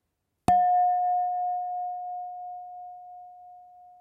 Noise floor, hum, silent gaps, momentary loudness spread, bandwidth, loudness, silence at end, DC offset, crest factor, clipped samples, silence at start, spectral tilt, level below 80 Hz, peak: -51 dBFS; none; none; 23 LU; 11 kHz; -26 LUFS; 0.1 s; under 0.1%; 20 dB; under 0.1%; 0.5 s; -6.5 dB/octave; -62 dBFS; -8 dBFS